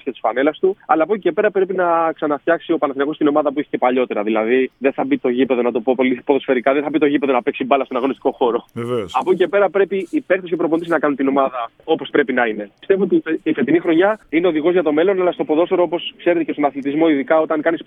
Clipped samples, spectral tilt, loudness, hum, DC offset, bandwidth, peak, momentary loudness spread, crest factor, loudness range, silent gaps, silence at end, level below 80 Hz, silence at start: under 0.1%; -7.5 dB/octave; -18 LUFS; none; under 0.1%; 7.8 kHz; -2 dBFS; 5 LU; 16 dB; 2 LU; none; 0.05 s; -64 dBFS; 0.05 s